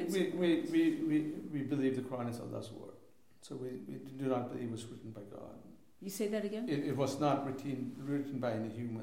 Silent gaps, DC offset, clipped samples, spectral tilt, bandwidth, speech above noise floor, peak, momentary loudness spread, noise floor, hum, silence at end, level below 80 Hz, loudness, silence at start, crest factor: none; under 0.1%; under 0.1%; -6.5 dB/octave; 16.5 kHz; 27 dB; -20 dBFS; 17 LU; -63 dBFS; none; 0 s; -76 dBFS; -37 LUFS; 0 s; 18 dB